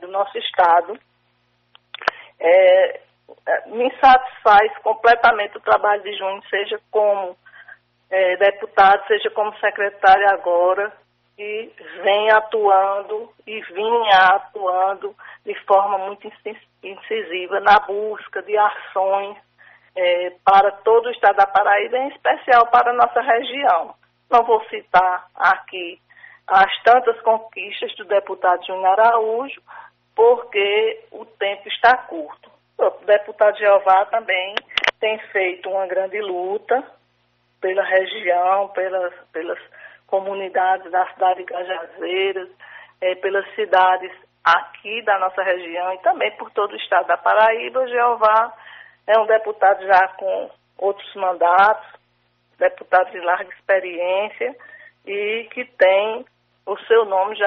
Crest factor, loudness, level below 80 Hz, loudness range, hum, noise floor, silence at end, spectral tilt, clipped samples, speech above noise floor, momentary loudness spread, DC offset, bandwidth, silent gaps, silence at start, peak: 16 dB; -18 LUFS; -62 dBFS; 6 LU; none; -64 dBFS; 0 s; 1 dB/octave; under 0.1%; 46 dB; 15 LU; under 0.1%; 6.4 kHz; none; 0 s; -2 dBFS